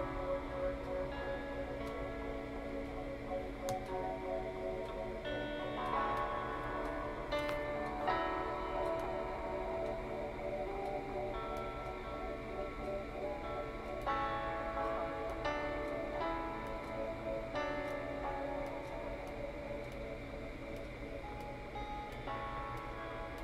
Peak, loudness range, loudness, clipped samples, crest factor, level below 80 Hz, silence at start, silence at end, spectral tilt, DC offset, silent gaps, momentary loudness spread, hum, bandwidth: -20 dBFS; 6 LU; -41 LUFS; under 0.1%; 20 dB; -50 dBFS; 0 s; 0 s; -6 dB/octave; under 0.1%; none; 7 LU; none; 15.5 kHz